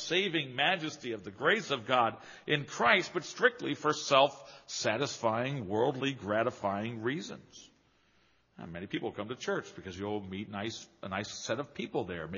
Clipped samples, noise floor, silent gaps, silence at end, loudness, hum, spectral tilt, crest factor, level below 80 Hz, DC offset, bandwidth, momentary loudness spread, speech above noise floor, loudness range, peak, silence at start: under 0.1%; -69 dBFS; none; 0 s; -32 LUFS; none; -2.5 dB/octave; 24 dB; -70 dBFS; under 0.1%; 7.2 kHz; 14 LU; 36 dB; 10 LU; -10 dBFS; 0 s